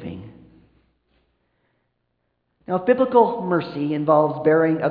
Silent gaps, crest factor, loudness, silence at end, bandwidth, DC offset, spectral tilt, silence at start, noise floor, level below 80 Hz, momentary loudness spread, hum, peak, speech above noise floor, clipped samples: none; 20 dB; -19 LUFS; 0 s; 5 kHz; under 0.1%; -10.5 dB/octave; 0 s; -73 dBFS; -62 dBFS; 10 LU; none; -2 dBFS; 54 dB; under 0.1%